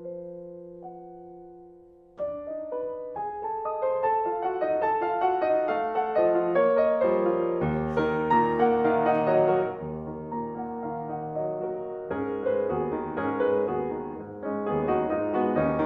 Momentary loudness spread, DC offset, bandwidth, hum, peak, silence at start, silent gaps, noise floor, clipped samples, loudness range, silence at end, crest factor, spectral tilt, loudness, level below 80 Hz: 13 LU; under 0.1%; 5.4 kHz; none; -10 dBFS; 0 s; none; -52 dBFS; under 0.1%; 8 LU; 0 s; 16 dB; -9.5 dB/octave; -27 LUFS; -56 dBFS